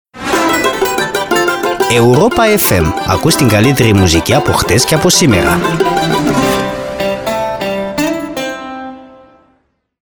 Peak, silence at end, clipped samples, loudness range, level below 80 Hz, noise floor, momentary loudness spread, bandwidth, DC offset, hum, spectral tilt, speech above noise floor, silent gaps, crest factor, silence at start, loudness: 0 dBFS; 1 s; under 0.1%; 7 LU; -32 dBFS; -58 dBFS; 9 LU; over 20 kHz; under 0.1%; none; -4.5 dB/octave; 49 dB; none; 12 dB; 0.15 s; -11 LUFS